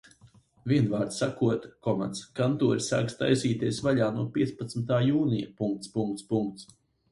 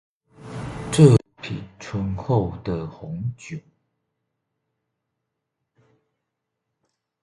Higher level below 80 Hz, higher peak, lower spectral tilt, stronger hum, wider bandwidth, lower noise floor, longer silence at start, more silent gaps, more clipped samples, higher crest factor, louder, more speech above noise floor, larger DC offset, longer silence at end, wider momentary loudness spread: second, -62 dBFS vs -48 dBFS; second, -10 dBFS vs 0 dBFS; about the same, -6.5 dB/octave vs -7 dB/octave; neither; about the same, 11.5 kHz vs 11.5 kHz; second, -59 dBFS vs -81 dBFS; first, 0.65 s vs 0.4 s; neither; neither; second, 18 dB vs 24 dB; second, -28 LUFS vs -22 LUFS; second, 31 dB vs 54 dB; neither; second, 0.5 s vs 3.65 s; second, 7 LU vs 22 LU